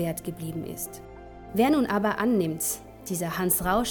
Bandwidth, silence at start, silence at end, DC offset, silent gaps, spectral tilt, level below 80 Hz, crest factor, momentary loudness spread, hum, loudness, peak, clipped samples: 19.5 kHz; 0 s; 0 s; under 0.1%; none; -4.5 dB/octave; -50 dBFS; 18 dB; 13 LU; none; -27 LUFS; -10 dBFS; under 0.1%